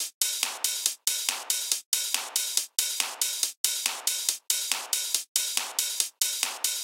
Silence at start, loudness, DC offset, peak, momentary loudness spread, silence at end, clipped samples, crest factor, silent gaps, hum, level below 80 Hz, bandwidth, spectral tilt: 0 s; -26 LUFS; under 0.1%; -4 dBFS; 1 LU; 0 s; under 0.1%; 26 dB; 0.14-0.21 s, 1.86-1.92 s, 3.57-3.64 s, 5.28-5.35 s; none; under -90 dBFS; 17 kHz; 6 dB/octave